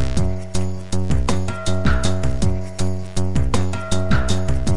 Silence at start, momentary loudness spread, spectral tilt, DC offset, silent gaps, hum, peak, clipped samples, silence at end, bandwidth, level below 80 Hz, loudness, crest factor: 0 s; 5 LU; -5.5 dB/octave; 9%; none; none; -4 dBFS; under 0.1%; 0 s; 11.5 kHz; -26 dBFS; -22 LUFS; 14 dB